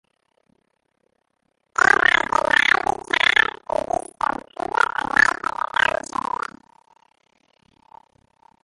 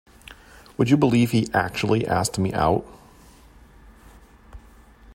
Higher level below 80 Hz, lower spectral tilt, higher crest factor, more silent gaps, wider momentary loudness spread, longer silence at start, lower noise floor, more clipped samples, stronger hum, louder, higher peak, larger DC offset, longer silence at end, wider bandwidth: second, -54 dBFS vs -48 dBFS; second, -1.5 dB/octave vs -6 dB/octave; about the same, 22 dB vs 20 dB; neither; first, 12 LU vs 8 LU; first, 1.8 s vs 0.25 s; first, -72 dBFS vs -50 dBFS; neither; neither; about the same, -19 LUFS vs -21 LUFS; about the same, -2 dBFS vs -4 dBFS; neither; first, 3.35 s vs 0.05 s; second, 11.5 kHz vs 16 kHz